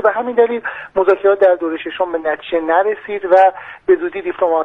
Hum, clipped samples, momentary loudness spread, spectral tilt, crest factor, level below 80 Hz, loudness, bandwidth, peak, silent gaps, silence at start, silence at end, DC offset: none; under 0.1%; 10 LU; -6 dB/octave; 14 dB; -56 dBFS; -16 LUFS; 5 kHz; 0 dBFS; none; 0 s; 0 s; under 0.1%